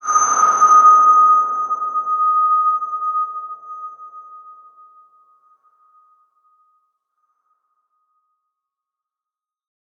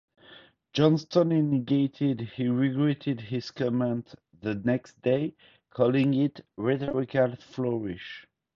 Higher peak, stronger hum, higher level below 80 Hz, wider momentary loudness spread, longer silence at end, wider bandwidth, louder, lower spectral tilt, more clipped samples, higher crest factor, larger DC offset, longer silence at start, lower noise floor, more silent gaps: first, -2 dBFS vs -8 dBFS; neither; second, -84 dBFS vs -64 dBFS; first, 23 LU vs 11 LU; first, 5.5 s vs 0.35 s; about the same, 6.8 kHz vs 7 kHz; first, -14 LUFS vs -27 LUFS; second, -0.5 dB/octave vs -8 dB/octave; neither; about the same, 16 dB vs 20 dB; neither; second, 0.05 s vs 0.3 s; first, -89 dBFS vs -54 dBFS; neither